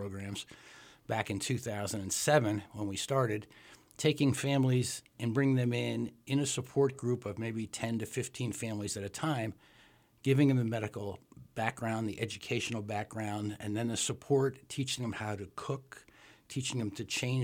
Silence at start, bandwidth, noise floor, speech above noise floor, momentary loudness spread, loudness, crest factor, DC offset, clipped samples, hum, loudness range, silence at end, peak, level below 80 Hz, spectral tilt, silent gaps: 0 s; 16.5 kHz; -63 dBFS; 30 dB; 12 LU; -34 LUFS; 20 dB; under 0.1%; under 0.1%; none; 4 LU; 0 s; -14 dBFS; -68 dBFS; -5 dB/octave; none